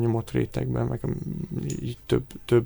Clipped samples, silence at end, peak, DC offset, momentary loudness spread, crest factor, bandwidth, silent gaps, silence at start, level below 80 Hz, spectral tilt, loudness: under 0.1%; 0 s; -10 dBFS; under 0.1%; 6 LU; 18 dB; over 20 kHz; none; 0 s; -44 dBFS; -7.5 dB/octave; -28 LUFS